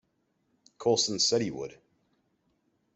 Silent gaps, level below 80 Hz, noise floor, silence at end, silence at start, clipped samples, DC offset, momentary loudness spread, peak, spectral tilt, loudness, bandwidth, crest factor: none; -72 dBFS; -75 dBFS; 1.2 s; 0.8 s; under 0.1%; under 0.1%; 15 LU; -14 dBFS; -3 dB/octave; -27 LUFS; 8.4 kHz; 20 dB